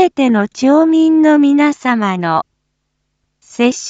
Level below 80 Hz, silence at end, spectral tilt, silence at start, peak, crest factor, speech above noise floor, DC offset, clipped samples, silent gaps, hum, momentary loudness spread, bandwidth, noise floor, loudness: -62 dBFS; 0 s; -5.5 dB/octave; 0 s; 0 dBFS; 12 dB; 57 dB; under 0.1%; under 0.1%; none; none; 8 LU; 8 kHz; -69 dBFS; -12 LUFS